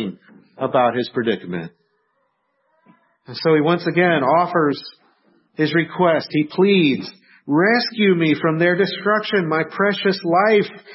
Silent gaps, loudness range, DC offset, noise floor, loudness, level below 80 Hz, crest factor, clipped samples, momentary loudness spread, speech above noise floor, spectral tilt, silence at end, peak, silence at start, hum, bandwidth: none; 5 LU; under 0.1%; -68 dBFS; -18 LUFS; -68 dBFS; 16 dB; under 0.1%; 14 LU; 50 dB; -9.5 dB/octave; 0 s; -4 dBFS; 0 s; none; 5.8 kHz